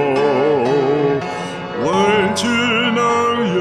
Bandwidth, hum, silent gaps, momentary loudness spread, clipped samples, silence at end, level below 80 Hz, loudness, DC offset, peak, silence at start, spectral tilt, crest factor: 13 kHz; none; none; 7 LU; under 0.1%; 0 s; -54 dBFS; -16 LUFS; under 0.1%; -2 dBFS; 0 s; -5 dB/octave; 14 dB